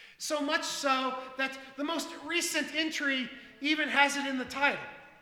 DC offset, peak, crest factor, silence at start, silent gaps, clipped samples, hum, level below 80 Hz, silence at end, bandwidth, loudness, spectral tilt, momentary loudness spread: under 0.1%; -8 dBFS; 24 dB; 0 s; none; under 0.1%; none; -72 dBFS; 0.1 s; 18 kHz; -30 LUFS; -1 dB/octave; 9 LU